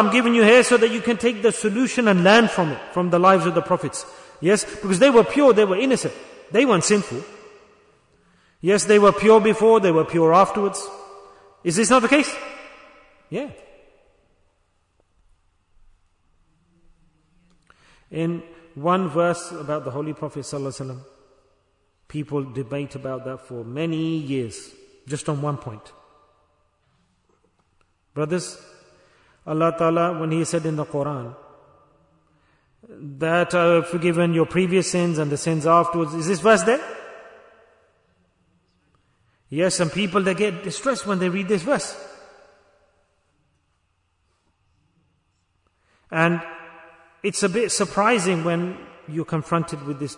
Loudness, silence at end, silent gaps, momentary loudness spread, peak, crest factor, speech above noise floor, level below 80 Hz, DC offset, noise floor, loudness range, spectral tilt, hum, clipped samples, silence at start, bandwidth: -20 LUFS; 0.05 s; none; 18 LU; -4 dBFS; 18 dB; 49 dB; -60 dBFS; under 0.1%; -69 dBFS; 15 LU; -5 dB/octave; none; under 0.1%; 0 s; 11 kHz